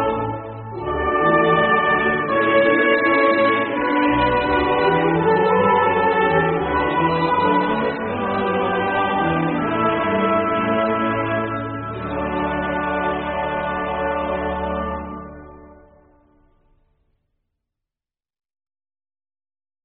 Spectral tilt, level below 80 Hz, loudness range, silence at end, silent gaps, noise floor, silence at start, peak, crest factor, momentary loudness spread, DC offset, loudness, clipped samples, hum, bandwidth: -4 dB/octave; -42 dBFS; 9 LU; 4.15 s; none; under -90 dBFS; 0 s; -4 dBFS; 16 dB; 10 LU; under 0.1%; -19 LUFS; under 0.1%; none; 4.3 kHz